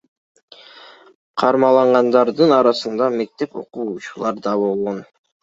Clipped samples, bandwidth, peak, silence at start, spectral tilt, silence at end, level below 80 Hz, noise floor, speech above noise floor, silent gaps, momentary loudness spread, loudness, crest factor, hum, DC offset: under 0.1%; 7.8 kHz; 0 dBFS; 1.35 s; -6 dB/octave; 0.4 s; -66 dBFS; -44 dBFS; 27 dB; none; 14 LU; -17 LUFS; 18 dB; none; under 0.1%